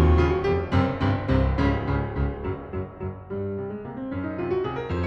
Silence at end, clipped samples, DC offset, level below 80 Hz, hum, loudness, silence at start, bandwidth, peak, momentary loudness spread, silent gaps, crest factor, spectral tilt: 0 s; under 0.1%; under 0.1%; -32 dBFS; none; -26 LUFS; 0 s; 6.6 kHz; -8 dBFS; 11 LU; none; 16 dB; -9 dB/octave